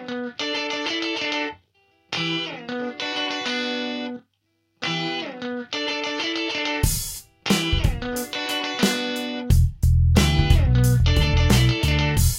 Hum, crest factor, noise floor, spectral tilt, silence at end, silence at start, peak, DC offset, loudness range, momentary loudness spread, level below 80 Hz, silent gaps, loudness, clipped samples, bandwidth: none; 20 dB; -71 dBFS; -4.5 dB/octave; 0 s; 0 s; -2 dBFS; under 0.1%; 8 LU; 12 LU; -28 dBFS; none; -23 LUFS; under 0.1%; 16.5 kHz